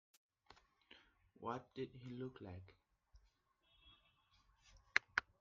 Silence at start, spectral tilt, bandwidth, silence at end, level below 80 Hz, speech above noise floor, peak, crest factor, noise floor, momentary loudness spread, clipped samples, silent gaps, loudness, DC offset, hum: 0.5 s; -2.5 dB/octave; 7.2 kHz; 0.2 s; -76 dBFS; 29 dB; -14 dBFS; 38 dB; -79 dBFS; 26 LU; under 0.1%; none; -45 LUFS; under 0.1%; none